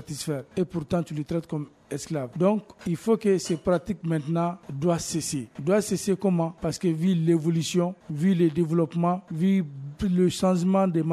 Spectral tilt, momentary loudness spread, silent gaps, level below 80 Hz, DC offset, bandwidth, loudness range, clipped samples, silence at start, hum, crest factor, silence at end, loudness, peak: -6.5 dB/octave; 8 LU; none; -54 dBFS; under 0.1%; 14 kHz; 3 LU; under 0.1%; 0 s; none; 16 dB; 0 s; -26 LUFS; -10 dBFS